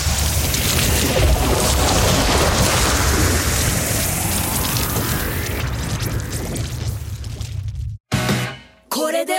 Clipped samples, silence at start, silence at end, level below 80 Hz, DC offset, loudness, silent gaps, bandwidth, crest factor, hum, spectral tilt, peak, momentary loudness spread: under 0.1%; 0 s; 0 s; -26 dBFS; under 0.1%; -18 LUFS; 8.00-8.04 s; 17 kHz; 16 dB; none; -3.5 dB/octave; -2 dBFS; 12 LU